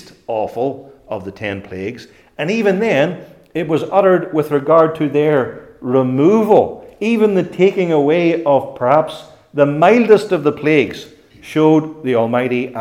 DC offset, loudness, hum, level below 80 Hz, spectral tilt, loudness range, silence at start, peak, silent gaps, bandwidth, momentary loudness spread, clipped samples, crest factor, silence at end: under 0.1%; -15 LUFS; none; -58 dBFS; -7.5 dB/octave; 5 LU; 0.3 s; 0 dBFS; none; 15 kHz; 14 LU; under 0.1%; 16 dB; 0 s